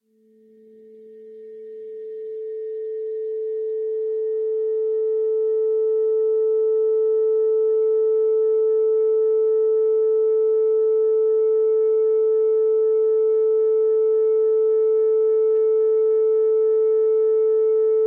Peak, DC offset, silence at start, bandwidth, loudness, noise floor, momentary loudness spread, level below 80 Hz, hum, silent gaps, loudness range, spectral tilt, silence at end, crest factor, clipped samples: -14 dBFS; under 0.1%; 1 s; 2.2 kHz; -20 LUFS; -56 dBFS; 10 LU; -86 dBFS; none; none; 9 LU; -8 dB/octave; 0 s; 4 dB; under 0.1%